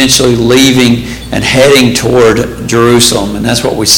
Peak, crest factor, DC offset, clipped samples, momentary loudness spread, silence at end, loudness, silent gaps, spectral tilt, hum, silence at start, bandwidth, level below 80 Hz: 0 dBFS; 8 dB; under 0.1%; 0.6%; 7 LU; 0 s; -7 LUFS; none; -3.5 dB/octave; none; 0 s; over 20 kHz; -30 dBFS